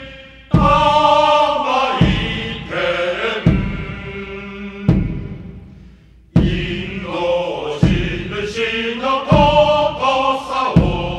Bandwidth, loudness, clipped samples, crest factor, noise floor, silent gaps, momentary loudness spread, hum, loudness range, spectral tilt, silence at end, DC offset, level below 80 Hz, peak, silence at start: 9.8 kHz; -16 LUFS; under 0.1%; 16 dB; -44 dBFS; none; 16 LU; none; 7 LU; -6.5 dB/octave; 0 s; under 0.1%; -28 dBFS; 0 dBFS; 0 s